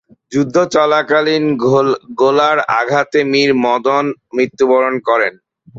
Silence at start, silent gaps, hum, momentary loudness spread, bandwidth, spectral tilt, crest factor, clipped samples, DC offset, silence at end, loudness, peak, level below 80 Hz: 0.3 s; none; none; 6 LU; 7.8 kHz; -5 dB/octave; 12 dB; under 0.1%; under 0.1%; 0 s; -14 LUFS; 0 dBFS; -58 dBFS